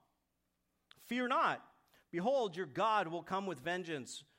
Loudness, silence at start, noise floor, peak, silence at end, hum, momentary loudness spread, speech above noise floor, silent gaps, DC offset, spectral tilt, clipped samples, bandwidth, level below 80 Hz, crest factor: -37 LUFS; 1 s; -84 dBFS; -20 dBFS; 0.15 s; none; 10 LU; 47 dB; none; under 0.1%; -4.5 dB/octave; under 0.1%; 16 kHz; -82 dBFS; 18 dB